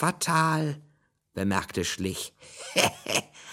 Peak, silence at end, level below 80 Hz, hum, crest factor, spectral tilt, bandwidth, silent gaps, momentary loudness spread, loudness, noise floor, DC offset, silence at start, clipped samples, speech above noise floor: -6 dBFS; 0 s; -60 dBFS; none; 24 dB; -3.5 dB/octave; 17 kHz; none; 15 LU; -27 LUFS; -56 dBFS; under 0.1%; 0 s; under 0.1%; 29 dB